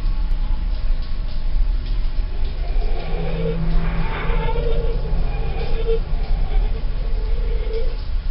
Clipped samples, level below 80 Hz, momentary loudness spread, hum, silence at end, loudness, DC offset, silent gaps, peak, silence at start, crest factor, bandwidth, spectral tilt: under 0.1%; -18 dBFS; 4 LU; none; 0 s; -26 LUFS; under 0.1%; none; -6 dBFS; 0 s; 12 dB; 5.6 kHz; -6 dB/octave